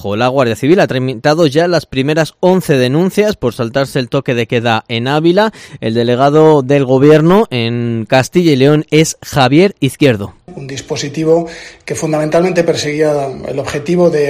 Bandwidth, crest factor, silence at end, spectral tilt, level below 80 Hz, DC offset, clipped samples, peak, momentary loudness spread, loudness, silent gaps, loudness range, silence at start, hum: 16 kHz; 12 dB; 0 s; -6 dB/octave; -46 dBFS; under 0.1%; 0.4%; 0 dBFS; 11 LU; -12 LUFS; none; 5 LU; 0 s; none